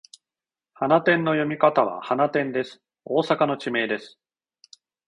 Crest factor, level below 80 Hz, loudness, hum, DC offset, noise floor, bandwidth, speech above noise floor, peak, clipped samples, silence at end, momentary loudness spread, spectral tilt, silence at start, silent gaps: 20 dB; -70 dBFS; -23 LUFS; none; under 0.1%; under -90 dBFS; 10.5 kHz; over 68 dB; -4 dBFS; under 0.1%; 1 s; 9 LU; -6.5 dB/octave; 0.8 s; none